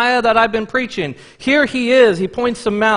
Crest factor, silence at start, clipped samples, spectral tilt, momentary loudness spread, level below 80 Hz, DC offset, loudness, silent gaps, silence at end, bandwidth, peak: 16 dB; 0 s; under 0.1%; -4.5 dB/octave; 11 LU; -48 dBFS; under 0.1%; -15 LUFS; none; 0 s; 10.5 kHz; 0 dBFS